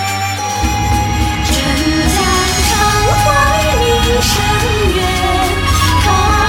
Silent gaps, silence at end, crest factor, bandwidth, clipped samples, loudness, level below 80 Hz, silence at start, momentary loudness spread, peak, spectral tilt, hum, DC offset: none; 0 s; 12 dB; 16.5 kHz; under 0.1%; -12 LUFS; -20 dBFS; 0 s; 4 LU; 0 dBFS; -4 dB/octave; none; under 0.1%